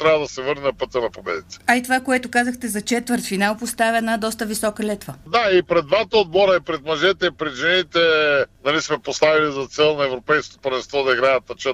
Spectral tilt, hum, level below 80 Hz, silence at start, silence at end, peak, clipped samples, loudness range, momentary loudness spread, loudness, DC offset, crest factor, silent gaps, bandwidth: -3.5 dB/octave; none; -52 dBFS; 0 s; 0 s; -4 dBFS; under 0.1%; 3 LU; 8 LU; -19 LUFS; under 0.1%; 16 dB; none; 15.5 kHz